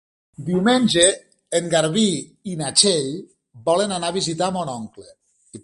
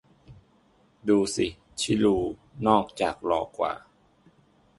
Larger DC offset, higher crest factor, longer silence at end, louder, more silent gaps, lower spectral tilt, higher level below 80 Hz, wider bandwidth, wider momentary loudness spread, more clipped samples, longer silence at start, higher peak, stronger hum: neither; about the same, 20 dB vs 22 dB; second, 0.05 s vs 1 s; first, -19 LUFS vs -26 LUFS; neither; second, -3.5 dB/octave vs -5 dB/octave; about the same, -58 dBFS vs -54 dBFS; about the same, 11.5 kHz vs 11.5 kHz; first, 16 LU vs 9 LU; neither; about the same, 0.4 s vs 0.3 s; first, 0 dBFS vs -6 dBFS; neither